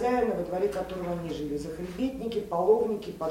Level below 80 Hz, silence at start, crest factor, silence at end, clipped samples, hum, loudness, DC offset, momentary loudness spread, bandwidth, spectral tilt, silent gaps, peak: -52 dBFS; 0 s; 18 dB; 0 s; under 0.1%; none; -30 LUFS; under 0.1%; 9 LU; 16.5 kHz; -6.5 dB/octave; none; -12 dBFS